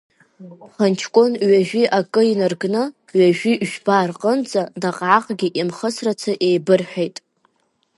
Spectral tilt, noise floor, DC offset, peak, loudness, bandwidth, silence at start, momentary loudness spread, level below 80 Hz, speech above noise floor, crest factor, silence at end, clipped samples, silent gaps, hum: -5.5 dB/octave; -66 dBFS; under 0.1%; 0 dBFS; -18 LUFS; 11.5 kHz; 0.4 s; 7 LU; -70 dBFS; 48 dB; 18 dB; 0.85 s; under 0.1%; none; none